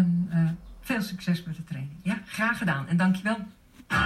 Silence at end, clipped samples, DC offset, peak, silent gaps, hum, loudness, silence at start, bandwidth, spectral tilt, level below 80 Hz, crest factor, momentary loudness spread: 0 s; under 0.1%; under 0.1%; -12 dBFS; none; none; -28 LUFS; 0 s; 15 kHz; -6.5 dB/octave; -54 dBFS; 14 dB; 12 LU